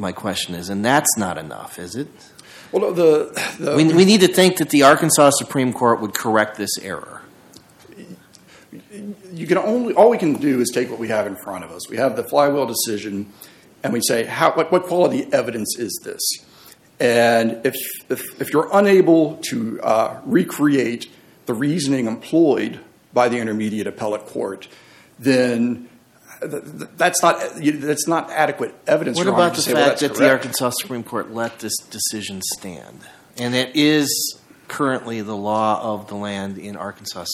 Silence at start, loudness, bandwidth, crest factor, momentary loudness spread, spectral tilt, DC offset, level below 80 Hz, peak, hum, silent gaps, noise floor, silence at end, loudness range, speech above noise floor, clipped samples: 0 s; -19 LUFS; 17 kHz; 20 dB; 16 LU; -4 dB/octave; under 0.1%; -64 dBFS; 0 dBFS; none; none; -48 dBFS; 0 s; 8 LU; 29 dB; under 0.1%